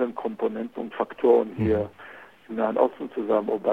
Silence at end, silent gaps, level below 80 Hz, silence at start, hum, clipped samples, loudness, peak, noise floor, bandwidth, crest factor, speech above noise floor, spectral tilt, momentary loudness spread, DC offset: 0 s; none; -54 dBFS; 0 s; none; under 0.1%; -25 LUFS; -6 dBFS; -46 dBFS; 4.6 kHz; 18 dB; 22 dB; -9 dB/octave; 14 LU; under 0.1%